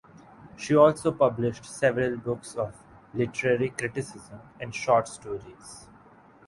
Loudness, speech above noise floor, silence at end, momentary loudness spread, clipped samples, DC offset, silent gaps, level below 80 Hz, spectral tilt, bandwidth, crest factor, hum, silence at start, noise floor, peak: -26 LUFS; 28 dB; 0.65 s; 22 LU; under 0.1%; under 0.1%; none; -60 dBFS; -6 dB/octave; 11.5 kHz; 22 dB; none; 0.4 s; -54 dBFS; -6 dBFS